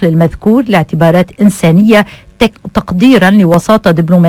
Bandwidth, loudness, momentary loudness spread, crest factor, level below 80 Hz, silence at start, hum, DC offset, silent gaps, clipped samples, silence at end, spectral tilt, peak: 16 kHz; -8 LUFS; 7 LU; 8 dB; -34 dBFS; 0 s; none; under 0.1%; none; 2%; 0 s; -7 dB/octave; 0 dBFS